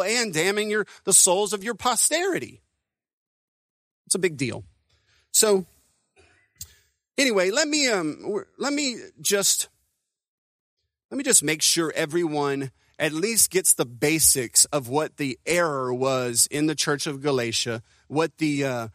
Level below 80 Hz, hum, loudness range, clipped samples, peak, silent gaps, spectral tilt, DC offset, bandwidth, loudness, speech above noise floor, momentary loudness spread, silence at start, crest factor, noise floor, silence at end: -60 dBFS; none; 6 LU; under 0.1%; 0 dBFS; 3.13-4.05 s, 10.28-10.77 s, 11.05-11.09 s; -2 dB/octave; under 0.1%; 15.5 kHz; -22 LUFS; 57 dB; 13 LU; 0 s; 24 dB; -81 dBFS; 0.05 s